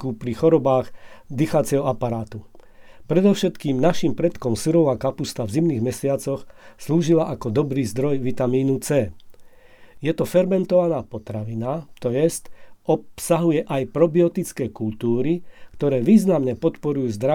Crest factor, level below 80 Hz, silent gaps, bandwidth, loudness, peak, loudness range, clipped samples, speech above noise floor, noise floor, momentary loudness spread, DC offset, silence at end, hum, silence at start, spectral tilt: 18 dB; -50 dBFS; none; 18.5 kHz; -21 LUFS; -4 dBFS; 2 LU; under 0.1%; 26 dB; -47 dBFS; 10 LU; under 0.1%; 0 s; none; 0 s; -7 dB/octave